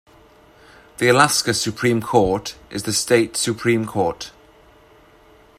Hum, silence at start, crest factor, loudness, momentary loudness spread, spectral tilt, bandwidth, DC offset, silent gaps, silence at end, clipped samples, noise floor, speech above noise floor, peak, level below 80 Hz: none; 1 s; 20 dB; -19 LUFS; 12 LU; -3.5 dB/octave; 15.5 kHz; under 0.1%; none; 1.3 s; under 0.1%; -50 dBFS; 31 dB; 0 dBFS; -50 dBFS